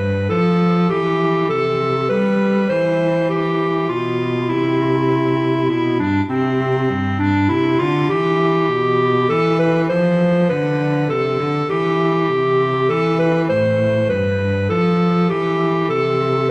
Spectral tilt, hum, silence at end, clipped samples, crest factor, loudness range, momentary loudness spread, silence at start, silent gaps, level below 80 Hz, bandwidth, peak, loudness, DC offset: -8 dB/octave; none; 0 s; under 0.1%; 12 dB; 2 LU; 3 LU; 0 s; none; -54 dBFS; 8.2 kHz; -4 dBFS; -17 LUFS; under 0.1%